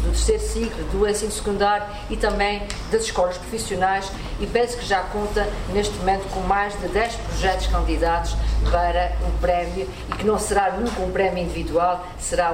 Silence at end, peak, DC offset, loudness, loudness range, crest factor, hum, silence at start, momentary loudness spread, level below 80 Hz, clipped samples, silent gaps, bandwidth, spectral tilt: 0 s; -6 dBFS; under 0.1%; -23 LUFS; 1 LU; 16 dB; none; 0 s; 5 LU; -28 dBFS; under 0.1%; none; 16 kHz; -4.5 dB/octave